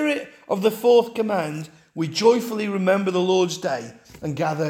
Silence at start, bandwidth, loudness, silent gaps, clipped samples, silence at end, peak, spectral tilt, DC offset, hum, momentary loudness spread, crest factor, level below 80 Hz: 0 s; 17 kHz; -22 LUFS; none; under 0.1%; 0 s; -4 dBFS; -5.5 dB/octave; under 0.1%; none; 13 LU; 18 dB; -64 dBFS